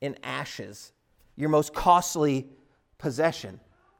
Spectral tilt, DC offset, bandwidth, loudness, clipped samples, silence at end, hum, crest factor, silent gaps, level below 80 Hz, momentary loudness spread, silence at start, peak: -5 dB/octave; under 0.1%; 18 kHz; -26 LUFS; under 0.1%; 0.4 s; none; 22 dB; none; -52 dBFS; 19 LU; 0 s; -6 dBFS